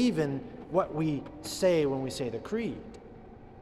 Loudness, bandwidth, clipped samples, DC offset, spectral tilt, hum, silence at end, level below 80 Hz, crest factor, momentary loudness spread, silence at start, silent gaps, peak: -31 LUFS; 13.5 kHz; under 0.1%; under 0.1%; -6 dB/octave; none; 0 s; -56 dBFS; 18 dB; 22 LU; 0 s; none; -12 dBFS